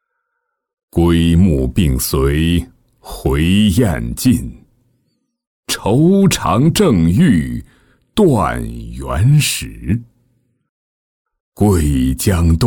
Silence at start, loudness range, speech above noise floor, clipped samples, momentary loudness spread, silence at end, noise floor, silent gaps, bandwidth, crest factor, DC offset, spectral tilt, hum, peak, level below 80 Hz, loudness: 0.95 s; 4 LU; 60 dB; under 0.1%; 11 LU; 0 s; -73 dBFS; 5.47-5.63 s, 10.69-11.25 s, 11.40-11.52 s; 19 kHz; 14 dB; under 0.1%; -6 dB/octave; none; -2 dBFS; -28 dBFS; -14 LUFS